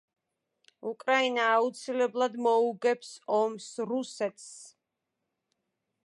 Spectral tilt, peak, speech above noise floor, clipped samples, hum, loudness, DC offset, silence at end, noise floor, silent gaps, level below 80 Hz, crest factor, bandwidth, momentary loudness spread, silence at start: -3 dB/octave; -12 dBFS; 56 dB; under 0.1%; none; -29 LUFS; under 0.1%; 1.4 s; -85 dBFS; none; -88 dBFS; 18 dB; 11.5 kHz; 14 LU; 0.85 s